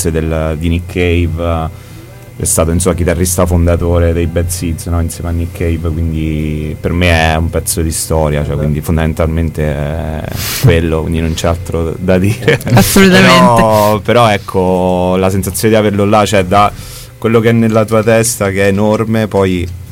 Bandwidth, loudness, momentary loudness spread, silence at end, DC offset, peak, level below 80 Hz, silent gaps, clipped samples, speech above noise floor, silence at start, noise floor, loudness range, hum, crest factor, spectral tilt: 17 kHz; -11 LUFS; 8 LU; 0 s; under 0.1%; 0 dBFS; -24 dBFS; none; 0.1%; 20 dB; 0 s; -31 dBFS; 6 LU; none; 10 dB; -5.5 dB/octave